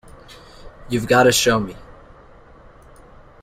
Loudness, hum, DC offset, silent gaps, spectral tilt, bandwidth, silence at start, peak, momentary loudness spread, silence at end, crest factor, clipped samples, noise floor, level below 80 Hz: -17 LUFS; none; under 0.1%; none; -3.5 dB/octave; 16 kHz; 0.65 s; -2 dBFS; 12 LU; 1.6 s; 20 dB; under 0.1%; -46 dBFS; -46 dBFS